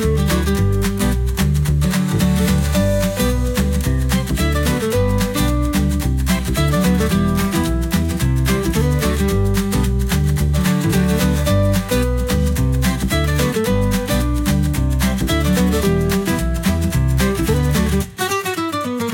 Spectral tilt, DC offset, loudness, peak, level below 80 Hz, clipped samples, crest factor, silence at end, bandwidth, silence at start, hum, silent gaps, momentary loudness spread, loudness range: -5.5 dB/octave; under 0.1%; -18 LUFS; -4 dBFS; -22 dBFS; under 0.1%; 12 dB; 0 s; 17 kHz; 0 s; none; none; 3 LU; 1 LU